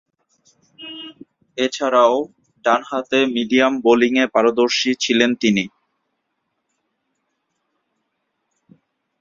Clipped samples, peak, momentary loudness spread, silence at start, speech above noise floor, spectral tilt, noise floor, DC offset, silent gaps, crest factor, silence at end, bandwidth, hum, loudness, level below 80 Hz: under 0.1%; 0 dBFS; 18 LU; 0.8 s; 57 dB; -3.5 dB/octave; -74 dBFS; under 0.1%; none; 20 dB; 3.55 s; 7.6 kHz; none; -17 LUFS; -64 dBFS